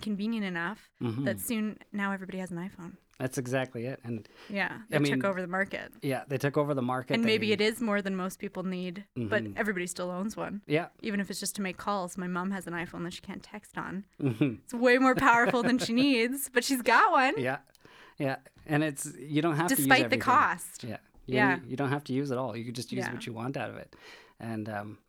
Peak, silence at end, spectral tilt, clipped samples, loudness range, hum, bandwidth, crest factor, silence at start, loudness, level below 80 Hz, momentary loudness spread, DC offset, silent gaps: -8 dBFS; 0.15 s; -4.5 dB/octave; under 0.1%; 9 LU; none; 19.5 kHz; 22 dB; 0 s; -30 LUFS; -64 dBFS; 16 LU; under 0.1%; none